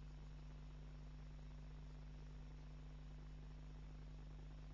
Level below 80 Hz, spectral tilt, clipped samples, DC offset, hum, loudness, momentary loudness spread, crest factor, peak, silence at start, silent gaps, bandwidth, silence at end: -56 dBFS; -7 dB/octave; under 0.1%; under 0.1%; 50 Hz at -55 dBFS; -58 LUFS; 0 LU; 8 dB; -48 dBFS; 0 s; none; 7.2 kHz; 0 s